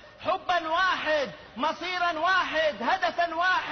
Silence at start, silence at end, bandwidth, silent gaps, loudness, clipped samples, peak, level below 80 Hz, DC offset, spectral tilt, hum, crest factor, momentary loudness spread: 0 s; 0 s; 6.6 kHz; none; -26 LUFS; under 0.1%; -14 dBFS; -60 dBFS; under 0.1%; -3 dB/octave; none; 12 dB; 6 LU